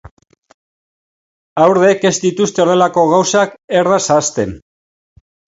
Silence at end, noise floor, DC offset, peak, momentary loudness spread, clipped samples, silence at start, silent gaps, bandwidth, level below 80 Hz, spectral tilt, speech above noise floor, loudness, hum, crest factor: 1 s; under -90 dBFS; under 0.1%; 0 dBFS; 7 LU; under 0.1%; 1.55 s; 3.64-3.68 s; 8 kHz; -50 dBFS; -4 dB/octave; over 78 dB; -13 LUFS; none; 14 dB